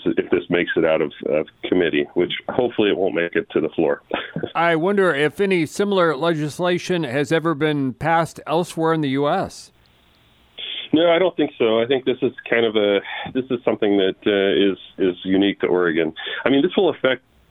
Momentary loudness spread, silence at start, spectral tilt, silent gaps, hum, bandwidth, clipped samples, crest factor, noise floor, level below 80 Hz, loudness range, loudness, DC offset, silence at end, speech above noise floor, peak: 6 LU; 0 s; -6 dB/octave; none; none; 14 kHz; under 0.1%; 20 dB; -55 dBFS; -58 dBFS; 2 LU; -20 LUFS; under 0.1%; 0.35 s; 36 dB; 0 dBFS